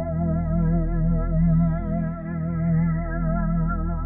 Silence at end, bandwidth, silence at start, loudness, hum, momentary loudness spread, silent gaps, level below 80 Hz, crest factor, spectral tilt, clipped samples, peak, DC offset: 0 s; 2.3 kHz; 0 s; -24 LUFS; none; 6 LU; none; -28 dBFS; 12 dB; -14.5 dB/octave; under 0.1%; -10 dBFS; under 0.1%